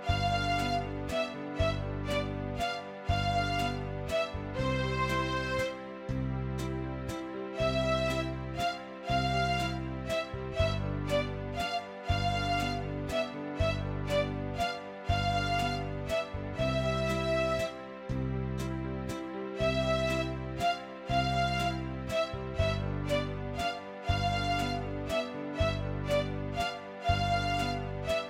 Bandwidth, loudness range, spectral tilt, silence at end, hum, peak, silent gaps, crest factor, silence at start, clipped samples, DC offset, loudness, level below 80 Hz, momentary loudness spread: 16.5 kHz; 1 LU; -5.5 dB/octave; 0 s; none; -16 dBFS; none; 16 dB; 0 s; under 0.1%; under 0.1%; -33 LUFS; -42 dBFS; 7 LU